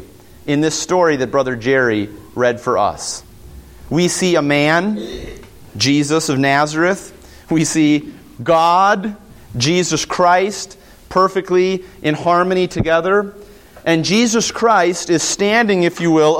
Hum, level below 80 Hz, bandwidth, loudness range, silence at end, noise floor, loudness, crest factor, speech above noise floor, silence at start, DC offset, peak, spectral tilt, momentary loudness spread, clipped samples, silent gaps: none; -44 dBFS; 16.5 kHz; 2 LU; 0 s; -38 dBFS; -15 LUFS; 16 dB; 23 dB; 0 s; under 0.1%; 0 dBFS; -4 dB/octave; 12 LU; under 0.1%; none